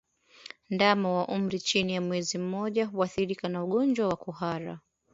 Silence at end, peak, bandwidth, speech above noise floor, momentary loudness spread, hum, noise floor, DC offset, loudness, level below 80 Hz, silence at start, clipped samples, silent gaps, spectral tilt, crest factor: 0.35 s; -6 dBFS; 7.8 kHz; 22 dB; 13 LU; none; -50 dBFS; under 0.1%; -29 LUFS; -66 dBFS; 0.7 s; under 0.1%; none; -5 dB/octave; 22 dB